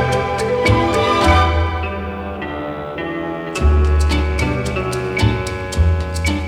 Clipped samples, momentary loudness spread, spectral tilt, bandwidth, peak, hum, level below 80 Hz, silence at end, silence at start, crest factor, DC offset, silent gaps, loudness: under 0.1%; 11 LU; -6 dB/octave; 13 kHz; -2 dBFS; none; -22 dBFS; 0 s; 0 s; 14 dB; under 0.1%; none; -18 LUFS